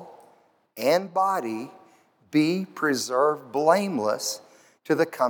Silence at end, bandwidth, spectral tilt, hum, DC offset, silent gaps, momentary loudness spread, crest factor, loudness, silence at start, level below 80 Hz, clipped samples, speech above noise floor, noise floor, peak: 0 s; 19.5 kHz; -4.5 dB/octave; none; under 0.1%; none; 12 LU; 20 dB; -25 LUFS; 0 s; -88 dBFS; under 0.1%; 36 dB; -60 dBFS; -6 dBFS